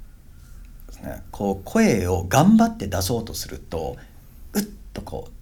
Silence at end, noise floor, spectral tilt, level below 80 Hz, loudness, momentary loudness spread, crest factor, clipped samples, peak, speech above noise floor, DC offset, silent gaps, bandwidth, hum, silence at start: 0 s; -44 dBFS; -5.5 dB/octave; -42 dBFS; -22 LUFS; 20 LU; 20 dB; under 0.1%; -4 dBFS; 22 dB; under 0.1%; none; 19.5 kHz; none; 0 s